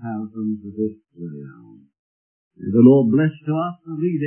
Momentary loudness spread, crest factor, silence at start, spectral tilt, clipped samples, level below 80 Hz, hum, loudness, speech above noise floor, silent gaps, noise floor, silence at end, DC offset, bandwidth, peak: 22 LU; 18 dB; 0 s; -13.5 dB/octave; under 0.1%; -68 dBFS; none; -19 LUFS; over 71 dB; 1.99-2.51 s; under -90 dBFS; 0 s; under 0.1%; 3.2 kHz; -2 dBFS